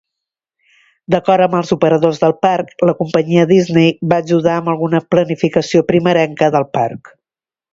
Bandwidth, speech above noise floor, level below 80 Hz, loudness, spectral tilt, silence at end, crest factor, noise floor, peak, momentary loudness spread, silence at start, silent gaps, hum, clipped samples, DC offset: 7.8 kHz; over 77 dB; -54 dBFS; -14 LUFS; -7 dB/octave; 0.75 s; 14 dB; under -90 dBFS; 0 dBFS; 5 LU; 1.1 s; none; none; under 0.1%; under 0.1%